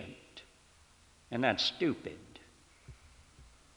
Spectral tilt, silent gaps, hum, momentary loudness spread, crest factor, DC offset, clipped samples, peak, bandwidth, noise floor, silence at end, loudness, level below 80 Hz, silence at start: -4.5 dB/octave; none; none; 27 LU; 26 dB; under 0.1%; under 0.1%; -12 dBFS; 19.5 kHz; -63 dBFS; 0.3 s; -33 LUFS; -64 dBFS; 0 s